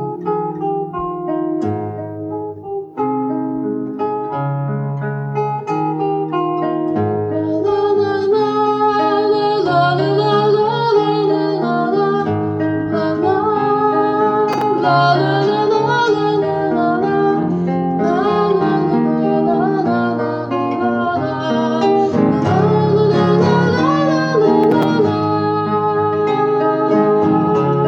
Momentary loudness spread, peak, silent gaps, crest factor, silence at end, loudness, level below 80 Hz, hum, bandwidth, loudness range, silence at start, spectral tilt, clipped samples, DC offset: 7 LU; 0 dBFS; none; 14 dB; 0 s; -16 LUFS; -56 dBFS; none; 7 kHz; 7 LU; 0 s; -8 dB/octave; under 0.1%; under 0.1%